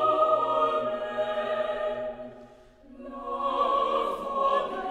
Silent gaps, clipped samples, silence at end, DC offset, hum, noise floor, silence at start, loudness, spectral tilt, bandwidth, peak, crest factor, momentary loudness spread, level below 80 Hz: none; under 0.1%; 0 s; under 0.1%; none; -52 dBFS; 0 s; -27 LUFS; -5 dB/octave; 10.5 kHz; -12 dBFS; 16 dB; 15 LU; -58 dBFS